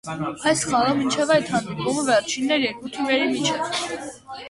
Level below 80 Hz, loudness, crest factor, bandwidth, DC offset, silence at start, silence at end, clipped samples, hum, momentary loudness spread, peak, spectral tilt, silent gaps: -58 dBFS; -22 LUFS; 18 dB; 11.5 kHz; under 0.1%; 0.05 s; 0 s; under 0.1%; none; 8 LU; -4 dBFS; -3.5 dB/octave; none